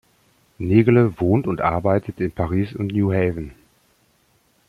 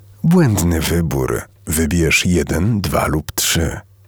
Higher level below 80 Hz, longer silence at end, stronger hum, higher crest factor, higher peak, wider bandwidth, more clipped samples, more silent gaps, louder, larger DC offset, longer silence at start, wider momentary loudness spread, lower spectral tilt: second, -46 dBFS vs -30 dBFS; first, 1.15 s vs 0.25 s; neither; about the same, 18 dB vs 14 dB; about the same, -2 dBFS vs -2 dBFS; second, 10.5 kHz vs over 20 kHz; neither; neither; second, -20 LUFS vs -16 LUFS; neither; first, 0.6 s vs 0.25 s; first, 11 LU vs 7 LU; first, -10 dB/octave vs -4.5 dB/octave